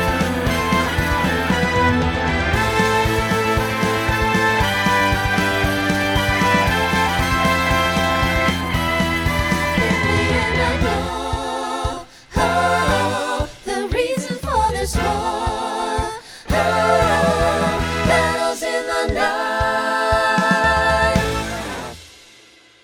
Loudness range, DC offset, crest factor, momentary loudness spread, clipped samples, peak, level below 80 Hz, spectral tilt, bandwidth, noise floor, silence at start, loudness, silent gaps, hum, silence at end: 3 LU; under 0.1%; 16 dB; 8 LU; under 0.1%; -2 dBFS; -30 dBFS; -4.5 dB/octave; over 20 kHz; -48 dBFS; 0 s; -18 LUFS; none; none; 0.75 s